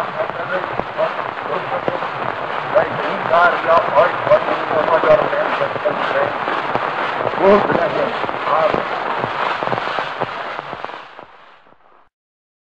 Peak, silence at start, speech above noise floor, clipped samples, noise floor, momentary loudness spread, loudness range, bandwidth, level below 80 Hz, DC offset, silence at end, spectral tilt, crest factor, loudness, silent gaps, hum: -4 dBFS; 0 s; 36 dB; under 0.1%; -50 dBFS; 10 LU; 7 LU; 8.2 kHz; -52 dBFS; 0.2%; 1.4 s; -6 dB/octave; 14 dB; -18 LUFS; none; none